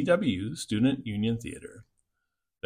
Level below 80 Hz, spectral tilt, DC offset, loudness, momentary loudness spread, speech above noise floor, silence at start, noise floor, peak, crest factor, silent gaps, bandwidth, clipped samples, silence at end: -58 dBFS; -6 dB/octave; under 0.1%; -29 LUFS; 16 LU; 55 dB; 0 s; -83 dBFS; -12 dBFS; 18 dB; none; 15 kHz; under 0.1%; 0.85 s